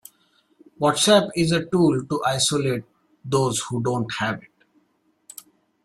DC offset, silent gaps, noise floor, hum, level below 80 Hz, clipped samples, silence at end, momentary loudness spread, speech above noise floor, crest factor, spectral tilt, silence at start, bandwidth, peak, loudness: under 0.1%; none; -67 dBFS; none; -58 dBFS; under 0.1%; 1.45 s; 24 LU; 45 dB; 20 dB; -4.5 dB/octave; 0.8 s; 15.5 kHz; -4 dBFS; -21 LUFS